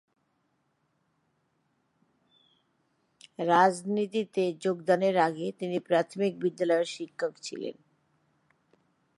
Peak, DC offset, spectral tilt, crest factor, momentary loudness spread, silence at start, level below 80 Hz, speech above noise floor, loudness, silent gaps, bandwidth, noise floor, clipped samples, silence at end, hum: -8 dBFS; under 0.1%; -5.5 dB/octave; 22 dB; 12 LU; 3.4 s; -84 dBFS; 47 dB; -28 LUFS; none; 11.5 kHz; -75 dBFS; under 0.1%; 1.45 s; none